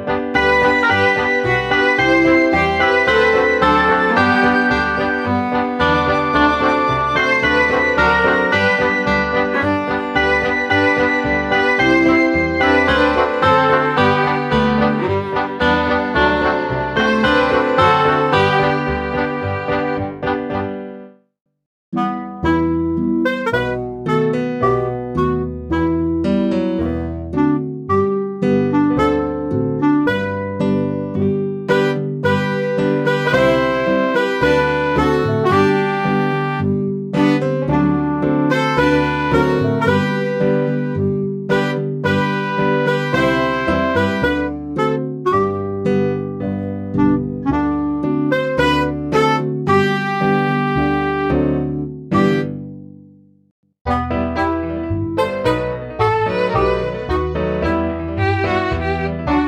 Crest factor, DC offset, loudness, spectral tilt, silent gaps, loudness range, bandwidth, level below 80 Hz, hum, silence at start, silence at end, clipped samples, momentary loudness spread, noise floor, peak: 14 dB; under 0.1%; -16 LUFS; -7 dB/octave; 21.66-21.92 s, 53.51-53.63 s, 53.81-53.85 s; 6 LU; 13 kHz; -36 dBFS; none; 0 s; 0 s; under 0.1%; 8 LU; -46 dBFS; -2 dBFS